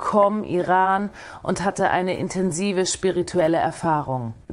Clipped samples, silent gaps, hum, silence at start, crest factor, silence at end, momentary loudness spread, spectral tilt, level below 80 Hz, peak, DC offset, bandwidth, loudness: under 0.1%; none; none; 0 s; 16 dB; 0 s; 8 LU; -5 dB/octave; -52 dBFS; -4 dBFS; under 0.1%; 11.5 kHz; -22 LUFS